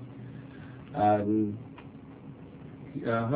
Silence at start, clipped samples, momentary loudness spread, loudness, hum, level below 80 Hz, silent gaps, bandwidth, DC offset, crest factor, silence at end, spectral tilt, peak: 0 s; under 0.1%; 21 LU; -29 LUFS; none; -60 dBFS; none; 4 kHz; under 0.1%; 18 dB; 0 s; -7.5 dB/octave; -14 dBFS